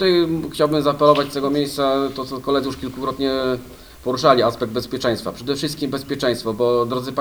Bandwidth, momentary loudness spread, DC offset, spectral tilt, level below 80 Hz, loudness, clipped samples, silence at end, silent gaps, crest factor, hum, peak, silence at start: over 20 kHz; 10 LU; under 0.1%; -5.5 dB/octave; -48 dBFS; -20 LUFS; under 0.1%; 0 s; none; 20 dB; none; 0 dBFS; 0 s